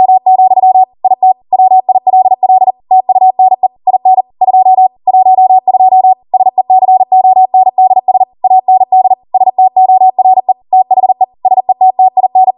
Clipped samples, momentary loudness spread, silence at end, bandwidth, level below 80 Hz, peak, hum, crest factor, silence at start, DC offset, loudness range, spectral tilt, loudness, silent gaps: under 0.1%; 4 LU; 0.05 s; 1.1 kHz; -64 dBFS; 0 dBFS; none; 6 dB; 0 s; under 0.1%; 1 LU; -10 dB/octave; -8 LUFS; none